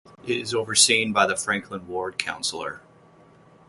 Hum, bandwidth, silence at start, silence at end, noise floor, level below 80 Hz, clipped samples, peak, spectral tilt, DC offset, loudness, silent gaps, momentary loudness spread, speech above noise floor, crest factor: none; 12 kHz; 0.25 s; 0.9 s; -53 dBFS; -64 dBFS; under 0.1%; -2 dBFS; -1.5 dB/octave; under 0.1%; -22 LUFS; none; 16 LU; 29 dB; 24 dB